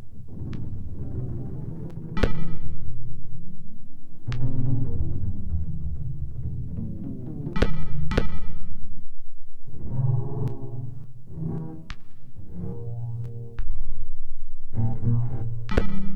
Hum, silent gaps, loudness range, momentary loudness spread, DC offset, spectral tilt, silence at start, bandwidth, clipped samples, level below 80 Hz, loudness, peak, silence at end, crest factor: none; none; 5 LU; 16 LU; under 0.1%; -8.5 dB/octave; 0 s; 4.8 kHz; under 0.1%; -32 dBFS; -32 LUFS; -8 dBFS; 0 s; 10 dB